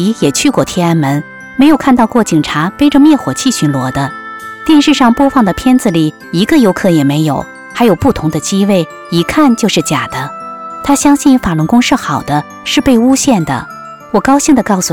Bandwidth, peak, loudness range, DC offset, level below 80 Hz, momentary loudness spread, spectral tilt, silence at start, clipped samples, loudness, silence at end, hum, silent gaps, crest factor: 18 kHz; 0 dBFS; 2 LU; under 0.1%; -36 dBFS; 11 LU; -5 dB/octave; 0 s; under 0.1%; -10 LUFS; 0 s; none; none; 10 dB